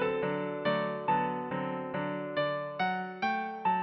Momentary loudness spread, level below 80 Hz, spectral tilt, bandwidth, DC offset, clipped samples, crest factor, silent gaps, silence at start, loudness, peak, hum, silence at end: 5 LU; -70 dBFS; -4 dB/octave; 6 kHz; under 0.1%; under 0.1%; 14 dB; none; 0 s; -32 LUFS; -18 dBFS; none; 0 s